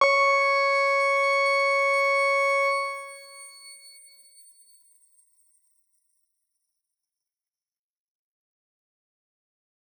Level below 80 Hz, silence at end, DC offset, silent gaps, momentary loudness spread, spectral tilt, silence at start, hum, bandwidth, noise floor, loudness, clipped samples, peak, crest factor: under -90 dBFS; 6.1 s; under 0.1%; none; 22 LU; 2.5 dB/octave; 0 s; none; 19 kHz; under -90 dBFS; -21 LUFS; under 0.1%; -8 dBFS; 20 dB